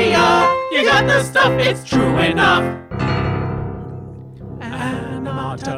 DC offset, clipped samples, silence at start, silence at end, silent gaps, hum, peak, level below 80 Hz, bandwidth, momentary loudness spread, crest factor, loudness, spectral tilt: under 0.1%; under 0.1%; 0 s; 0 s; none; none; -2 dBFS; -40 dBFS; 14.5 kHz; 18 LU; 14 dB; -16 LUFS; -5 dB/octave